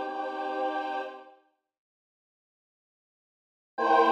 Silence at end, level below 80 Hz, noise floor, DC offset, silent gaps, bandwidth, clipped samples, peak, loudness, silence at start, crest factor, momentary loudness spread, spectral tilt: 0 s; under -90 dBFS; -63 dBFS; under 0.1%; 1.78-3.77 s; 8.2 kHz; under 0.1%; -10 dBFS; -30 LUFS; 0 s; 22 dB; 17 LU; -3.5 dB/octave